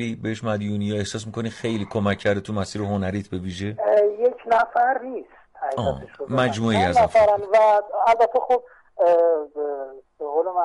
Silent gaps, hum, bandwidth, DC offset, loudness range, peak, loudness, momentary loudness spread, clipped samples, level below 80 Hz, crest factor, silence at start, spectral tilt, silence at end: none; none; 11.5 kHz; under 0.1%; 7 LU; -8 dBFS; -22 LUFS; 12 LU; under 0.1%; -52 dBFS; 12 dB; 0 s; -6 dB/octave; 0 s